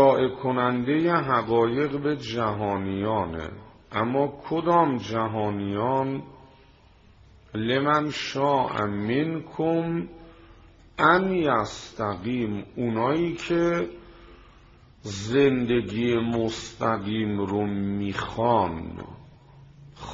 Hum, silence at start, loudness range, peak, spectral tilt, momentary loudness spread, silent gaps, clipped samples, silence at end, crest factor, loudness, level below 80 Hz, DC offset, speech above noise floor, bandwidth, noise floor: none; 0 s; 3 LU; -6 dBFS; -5 dB/octave; 12 LU; none; under 0.1%; 0 s; 20 dB; -25 LUFS; -54 dBFS; under 0.1%; 30 dB; 7.6 kHz; -54 dBFS